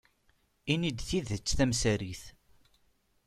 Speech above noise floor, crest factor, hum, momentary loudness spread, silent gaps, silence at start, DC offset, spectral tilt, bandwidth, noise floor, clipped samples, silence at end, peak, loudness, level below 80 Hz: 40 dB; 22 dB; none; 14 LU; none; 0.65 s; under 0.1%; -4.5 dB/octave; 14.5 kHz; -71 dBFS; under 0.1%; 0.95 s; -12 dBFS; -31 LUFS; -46 dBFS